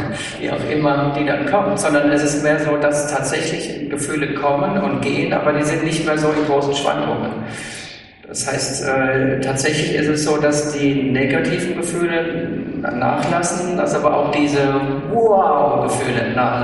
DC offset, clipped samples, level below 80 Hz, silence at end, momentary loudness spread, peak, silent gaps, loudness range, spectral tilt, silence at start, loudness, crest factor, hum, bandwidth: under 0.1%; under 0.1%; -48 dBFS; 0 s; 8 LU; -2 dBFS; none; 3 LU; -5 dB/octave; 0 s; -18 LUFS; 16 dB; none; 11.5 kHz